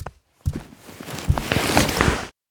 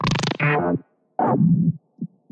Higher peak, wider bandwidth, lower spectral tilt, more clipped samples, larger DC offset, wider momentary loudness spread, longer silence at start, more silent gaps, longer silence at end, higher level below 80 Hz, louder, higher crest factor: first, 0 dBFS vs -6 dBFS; first, over 20 kHz vs 8.8 kHz; second, -4.5 dB/octave vs -6.5 dB/octave; neither; neither; first, 20 LU vs 15 LU; about the same, 0 s vs 0 s; neither; about the same, 0.2 s vs 0.25 s; first, -34 dBFS vs -48 dBFS; about the same, -22 LUFS vs -21 LUFS; first, 24 dB vs 16 dB